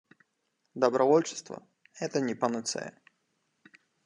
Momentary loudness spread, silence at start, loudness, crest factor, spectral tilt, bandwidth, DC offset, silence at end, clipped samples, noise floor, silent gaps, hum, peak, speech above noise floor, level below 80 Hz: 21 LU; 0.75 s; -29 LUFS; 22 dB; -4.5 dB/octave; 11 kHz; under 0.1%; 1.15 s; under 0.1%; -78 dBFS; none; none; -10 dBFS; 50 dB; -82 dBFS